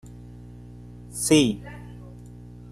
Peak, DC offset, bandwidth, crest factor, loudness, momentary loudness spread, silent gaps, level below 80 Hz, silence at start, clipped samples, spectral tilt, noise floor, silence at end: -6 dBFS; under 0.1%; 13 kHz; 22 dB; -22 LUFS; 25 LU; none; -48 dBFS; 0.05 s; under 0.1%; -4 dB/octave; -43 dBFS; 0.55 s